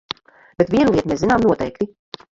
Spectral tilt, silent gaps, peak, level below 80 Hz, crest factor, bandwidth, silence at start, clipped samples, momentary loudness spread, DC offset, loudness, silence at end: -6.5 dB/octave; none; -2 dBFS; -44 dBFS; 18 dB; 7.8 kHz; 0.6 s; under 0.1%; 16 LU; under 0.1%; -18 LUFS; 0.5 s